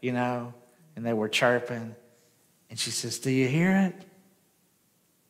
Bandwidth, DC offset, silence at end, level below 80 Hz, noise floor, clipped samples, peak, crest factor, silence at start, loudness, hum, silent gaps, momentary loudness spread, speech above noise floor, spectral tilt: 16 kHz; under 0.1%; 1.25 s; -74 dBFS; -68 dBFS; under 0.1%; -10 dBFS; 20 dB; 0 s; -27 LUFS; none; none; 19 LU; 41 dB; -4.5 dB/octave